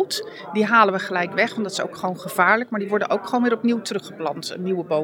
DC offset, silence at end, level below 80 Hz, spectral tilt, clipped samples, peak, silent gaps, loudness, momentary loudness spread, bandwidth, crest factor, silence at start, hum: under 0.1%; 0 s; -78 dBFS; -4.5 dB/octave; under 0.1%; -2 dBFS; none; -22 LUFS; 11 LU; 19.5 kHz; 20 dB; 0 s; none